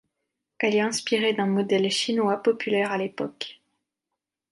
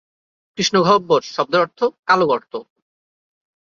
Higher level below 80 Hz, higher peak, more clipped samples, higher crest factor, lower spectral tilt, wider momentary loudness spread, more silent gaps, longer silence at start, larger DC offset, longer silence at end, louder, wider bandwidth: second, -76 dBFS vs -62 dBFS; second, -8 dBFS vs -2 dBFS; neither; about the same, 18 dB vs 18 dB; about the same, -4 dB/octave vs -4 dB/octave; second, 9 LU vs 15 LU; second, none vs 1.99-2.03 s; about the same, 0.6 s vs 0.6 s; neither; second, 1 s vs 1.15 s; second, -24 LUFS vs -17 LUFS; first, 11.5 kHz vs 7.6 kHz